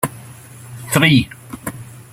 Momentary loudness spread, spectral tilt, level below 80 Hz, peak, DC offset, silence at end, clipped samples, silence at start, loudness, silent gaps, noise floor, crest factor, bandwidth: 25 LU; -4.5 dB/octave; -48 dBFS; 0 dBFS; under 0.1%; 0.1 s; under 0.1%; 0.05 s; -15 LUFS; none; -38 dBFS; 20 dB; 16.5 kHz